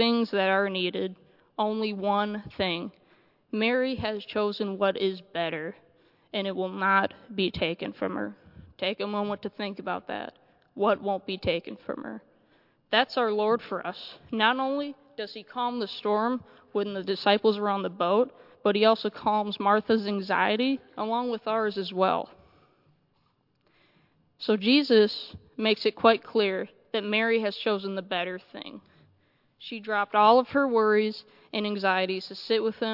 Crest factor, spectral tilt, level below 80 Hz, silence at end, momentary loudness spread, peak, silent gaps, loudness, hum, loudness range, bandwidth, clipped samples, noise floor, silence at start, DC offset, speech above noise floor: 24 dB; -7 dB/octave; -66 dBFS; 0 s; 14 LU; -4 dBFS; none; -27 LUFS; none; 6 LU; 5.8 kHz; under 0.1%; -70 dBFS; 0 s; under 0.1%; 43 dB